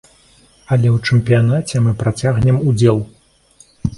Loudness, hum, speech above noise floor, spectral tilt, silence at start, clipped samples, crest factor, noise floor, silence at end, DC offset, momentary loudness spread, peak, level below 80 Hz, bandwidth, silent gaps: -15 LUFS; none; 36 dB; -7 dB/octave; 0.7 s; under 0.1%; 16 dB; -50 dBFS; 0 s; under 0.1%; 7 LU; 0 dBFS; -40 dBFS; 11.5 kHz; none